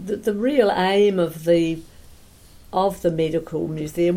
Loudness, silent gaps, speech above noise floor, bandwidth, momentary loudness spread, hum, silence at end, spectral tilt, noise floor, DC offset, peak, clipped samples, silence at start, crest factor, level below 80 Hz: -21 LUFS; none; 27 dB; 16.5 kHz; 9 LU; none; 0 s; -6.5 dB/octave; -47 dBFS; under 0.1%; -4 dBFS; under 0.1%; 0 s; 16 dB; -48 dBFS